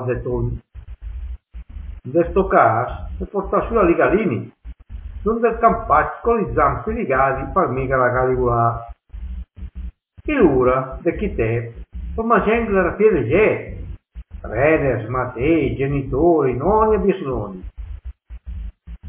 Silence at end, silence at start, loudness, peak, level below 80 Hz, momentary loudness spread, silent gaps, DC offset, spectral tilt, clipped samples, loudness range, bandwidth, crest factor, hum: 0 s; 0 s; -18 LUFS; 0 dBFS; -32 dBFS; 21 LU; none; under 0.1%; -11.5 dB/octave; under 0.1%; 3 LU; 3.7 kHz; 18 dB; none